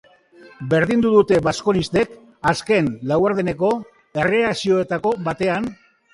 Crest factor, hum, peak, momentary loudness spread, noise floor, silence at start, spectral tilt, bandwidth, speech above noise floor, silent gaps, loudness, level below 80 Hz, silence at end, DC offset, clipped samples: 18 dB; none; -2 dBFS; 9 LU; -47 dBFS; 0.45 s; -6 dB/octave; 11.5 kHz; 29 dB; none; -19 LUFS; -50 dBFS; 0.4 s; under 0.1%; under 0.1%